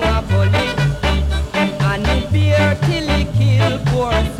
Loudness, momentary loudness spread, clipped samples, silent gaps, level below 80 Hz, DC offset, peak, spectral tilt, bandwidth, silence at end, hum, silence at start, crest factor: -16 LUFS; 4 LU; under 0.1%; none; -24 dBFS; under 0.1%; -6 dBFS; -6.5 dB/octave; 13.5 kHz; 0 s; none; 0 s; 10 dB